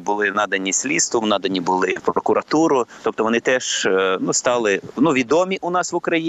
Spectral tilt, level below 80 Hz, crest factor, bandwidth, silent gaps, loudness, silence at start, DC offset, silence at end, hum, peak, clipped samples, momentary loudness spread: -3 dB/octave; -62 dBFS; 16 dB; 12 kHz; none; -19 LUFS; 0 s; under 0.1%; 0 s; none; -2 dBFS; under 0.1%; 4 LU